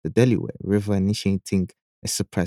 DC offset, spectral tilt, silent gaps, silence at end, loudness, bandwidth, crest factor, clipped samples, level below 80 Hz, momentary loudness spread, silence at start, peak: under 0.1%; -6 dB/octave; 1.82-2.02 s; 0 s; -23 LUFS; 15.5 kHz; 18 dB; under 0.1%; -52 dBFS; 8 LU; 0.05 s; -4 dBFS